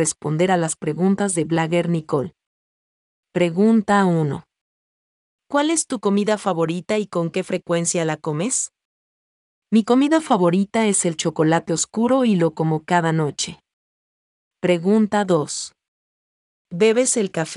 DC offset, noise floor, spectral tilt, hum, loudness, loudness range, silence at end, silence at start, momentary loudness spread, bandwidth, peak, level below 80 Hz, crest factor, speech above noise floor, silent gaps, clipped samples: under 0.1%; under -90 dBFS; -5 dB/octave; none; -20 LUFS; 4 LU; 0 s; 0 s; 8 LU; 11.5 kHz; -4 dBFS; -64 dBFS; 16 dB; over 71 dB; 2.47-3.23 s, 4.61-5.39 s, 8.85-9.62 s, 13.73-14.51 s, 15.88-16.65 s; under 0.1%